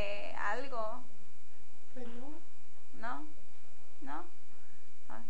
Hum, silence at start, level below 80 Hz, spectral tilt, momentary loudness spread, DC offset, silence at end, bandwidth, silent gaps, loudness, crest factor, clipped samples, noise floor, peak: none; 0 s; -70 dBFS; -5.5 dB/octave; 25 LU; 6%; 0 s; 10 kHz; none; -43 LUFS; 22 dB; under 0.1%; -63 dBFS; -18 dBFS